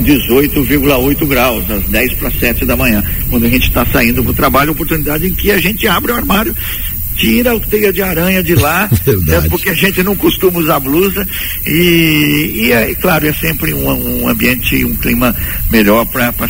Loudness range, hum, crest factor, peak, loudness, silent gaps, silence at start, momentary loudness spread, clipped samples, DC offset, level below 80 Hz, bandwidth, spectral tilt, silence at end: 1 LU; none; 12 dB; 0 dBFS; -11 LUFS; none; 0 s; 4 LU; under 0.1%; under 0.1%; -22 dBFS; 16.5 kHz; -5 dB/octave; 0 s